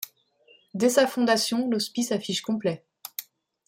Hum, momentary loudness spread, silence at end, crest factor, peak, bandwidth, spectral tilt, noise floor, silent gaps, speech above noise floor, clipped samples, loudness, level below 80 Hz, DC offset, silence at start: none; 16 LU; 0.45 s; 20 dB; -8 dBFS; 16.5 kHz; -3.5 dB/octave; -60 dBFS; none; 36 dB; under 0.1%; -25 LUFS; -72 dBFS; under 0.1%; 0 s